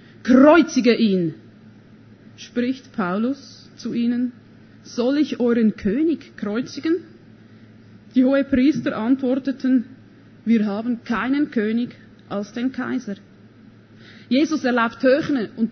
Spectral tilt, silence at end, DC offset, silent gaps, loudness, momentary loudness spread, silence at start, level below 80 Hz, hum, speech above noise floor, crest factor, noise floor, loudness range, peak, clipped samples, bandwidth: -6 dB/octave; 0 s; under 0.1%; none; -20 LUFS; 12 LU; 0.25 s; -56 dBFS; none; 28 dB; 20 dB; -47 dBFS; 5 LU; -2 dBFS; under 0.1%; 6.6 kHz